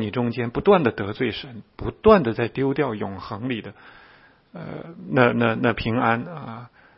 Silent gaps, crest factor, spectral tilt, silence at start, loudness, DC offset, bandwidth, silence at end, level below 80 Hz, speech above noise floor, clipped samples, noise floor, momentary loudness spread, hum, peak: none; 22 dB; -11 dB/octave; 0 s; -22 LUFS; under 0.1%; 5.8 kHz; 0.3 s; -46 dBFS; 31 dB; under 0.1%; -53 dBFS; 18 LU; none; 0 dBFS